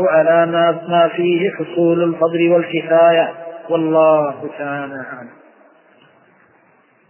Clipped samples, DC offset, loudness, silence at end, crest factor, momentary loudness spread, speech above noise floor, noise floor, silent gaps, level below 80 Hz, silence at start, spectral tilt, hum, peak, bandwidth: under 0.1%; under 0.1%; -15 LUFS; 1.8 s; 14 dB; 14 LU; 39 dB; -54 dBFS; none; -70 dBFS; 0 s; -10 dB/octave; none; -2 dBFS; 3.2 kHz